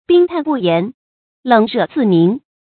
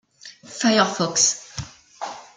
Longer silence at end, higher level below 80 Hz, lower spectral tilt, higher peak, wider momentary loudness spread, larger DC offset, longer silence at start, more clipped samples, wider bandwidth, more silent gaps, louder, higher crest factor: first, 0.3 s vs 0.15 s; about the same, -60 dBFS vs -56 dBFS; first, -10 dB/octave vs -2 dB/octave; first, 0 dBFS vs -4 dBFS; second, 12 LU vs 18 LU; neither; second, 0.1 s vs 0.25 s; neither; second, 4.5 kHz vs 11 kHz; first, 0.94-1.43 s vs none; first, -14 LUFS vs -19 LUFS; second, 14 dB vs 20 dB